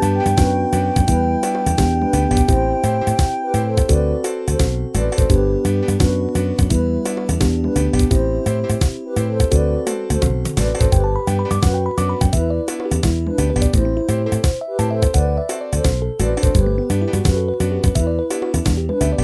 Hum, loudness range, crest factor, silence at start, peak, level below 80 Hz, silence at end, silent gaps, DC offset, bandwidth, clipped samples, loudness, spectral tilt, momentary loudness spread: none; 1 LU; 16 dB; 0 s; -2 dBFS; -22 dBFS; 0 s; none; 0.1%; 11 kHz; under 0.1%; -18 LUFS; -6.5 dB/octave; 4 LU